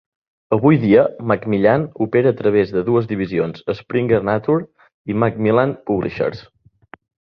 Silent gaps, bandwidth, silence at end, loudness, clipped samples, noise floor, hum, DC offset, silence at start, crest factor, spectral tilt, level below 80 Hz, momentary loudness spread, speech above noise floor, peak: 4.94-5.05 s; 5.8 kHz; 0.9 s; -18 LUFS; under 0.1%; -46 dBFS; none; under 0.1%; 0.5 s; 16 dB; -10 dB/octave; -50 dBFS; 9 LU; 29 dB; -2 dBFS